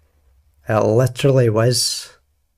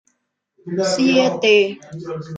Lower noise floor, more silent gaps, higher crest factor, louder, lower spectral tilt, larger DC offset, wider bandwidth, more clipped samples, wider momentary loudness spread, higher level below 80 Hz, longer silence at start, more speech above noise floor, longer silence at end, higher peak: second, -57 dBFS vs -71 dBFS; neither; about the same, 16 dB vs 18 dB; about the same, -17 LUFS vs -17 LUFS; about the same, -5 dB/octave vs -4.5 dB/octave; neither; first, 15.5 kHz vs 9.4 kHz; neither; second, 9 LU vs 16 LU; first, -50 dBFS vs -64 dBFS; about the same, 0.7 s vs 0.65 s; second, 41 dB vs 53 dB; first, 0.5 s vs 0 s; about the same, -4 dBFS vs -2 dBFS